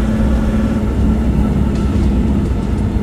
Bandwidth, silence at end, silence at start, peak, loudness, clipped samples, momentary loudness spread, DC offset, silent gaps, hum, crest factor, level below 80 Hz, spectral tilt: 10.5 kHz; 0 s; 0 s; -2 dBFS; -16 LUFS; under 0.1%; 2 LU; under 0.1%; none; none; 12 dB; -18 dBFS; -8.5 dB/octave